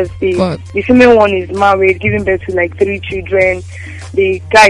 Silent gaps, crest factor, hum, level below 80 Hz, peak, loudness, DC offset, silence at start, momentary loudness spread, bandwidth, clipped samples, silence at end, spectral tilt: none; 12 dB; none; -36 dBFS; 0 dBFS; -12 LUFS; under 0.1%; 0 s; 12 LU; 11.5 kHz; 0.3%; 0 s; -5.5 dB/octave